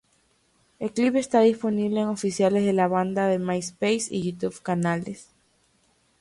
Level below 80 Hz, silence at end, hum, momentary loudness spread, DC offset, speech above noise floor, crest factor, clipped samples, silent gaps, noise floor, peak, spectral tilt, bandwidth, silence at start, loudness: -64 dBFS; 0.95 s; none; 10 LU; under 0.1%; 42 dB; 16 dB; under 0.1%; none; -66 dBFS; -8 dBFS; -5.5 dB/octave; 11.5 kHz; 0.8 s; -24 LUFS